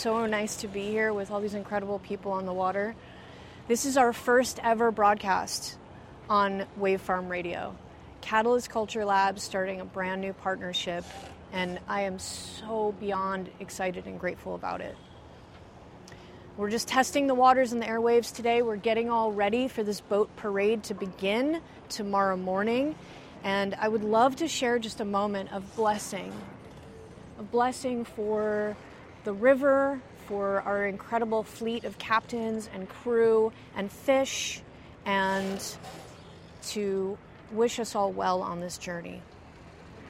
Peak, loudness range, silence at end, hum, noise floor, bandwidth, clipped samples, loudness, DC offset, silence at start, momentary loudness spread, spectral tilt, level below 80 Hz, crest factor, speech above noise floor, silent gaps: -10 dBFS; 6 LU; 0 s; none; -49 dBFS; 16 kHz; under 0.1%; -29 LUFS; under 0.1%; 0 s; 19 LU; -4 dB/octave; -60 dBFS; 20 dB; 21 dB; none